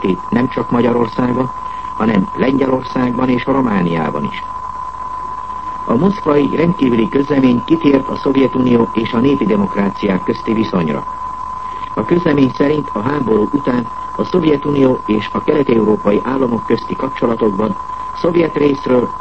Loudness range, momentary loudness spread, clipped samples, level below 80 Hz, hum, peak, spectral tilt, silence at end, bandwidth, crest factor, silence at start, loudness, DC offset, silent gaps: 3 LU; 11 LU; under 0.1%; -42 dBFS; none; 0 dBFS; -8.5 dB/octave; 0 s; 8.2 kHz; 14 dB; 0 s; -15 LUFS; 1%; none